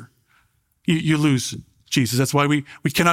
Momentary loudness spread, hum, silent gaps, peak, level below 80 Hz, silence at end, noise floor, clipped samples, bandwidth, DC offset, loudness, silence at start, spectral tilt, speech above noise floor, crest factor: 10 LU; none; none; -2 dBFS; -54 dBFS; 0 s; -63 dBFS; under 0.1%; 16.5 kHz; under 0.1%; -21 LUFS; 0 s; -5 dB/octave; 44 dB; 18 dB